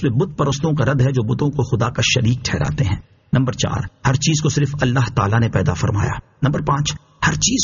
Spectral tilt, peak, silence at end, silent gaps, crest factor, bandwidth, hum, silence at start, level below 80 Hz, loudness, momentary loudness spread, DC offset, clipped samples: -5.5 dB/octave; -4 dBFS; 0 s; none; 14 dB; 7.4 kHz; none; 0 s; -38 dBFS; -19 LUFS; 5 LU; under 0.1%; under 0.1%